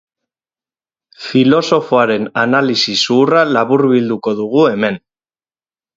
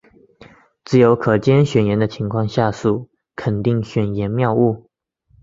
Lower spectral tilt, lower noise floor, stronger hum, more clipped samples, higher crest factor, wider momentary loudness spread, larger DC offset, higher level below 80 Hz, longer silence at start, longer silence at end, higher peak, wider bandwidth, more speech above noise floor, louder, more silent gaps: second, -5 dB/octave vs -8 dB/octave; first, under -90 dBFS vs -59 dBFS; neither; neither; about the same, 14 dB vs 16 dB; about the same, 7 LU vs 9 LU; neither; second, -60 dBFS vs -48 dBFS; first, 1.2 s vs 0.9 s; first, 1 s vs 0.65 s; about the same, 0 dBFS vs -2 dBFS; about the same, 7.8 kHz vs 7.6 kHz; first, over 77 dB vs 43 dB; first, -13 LUFS vs -18 LUFS; neither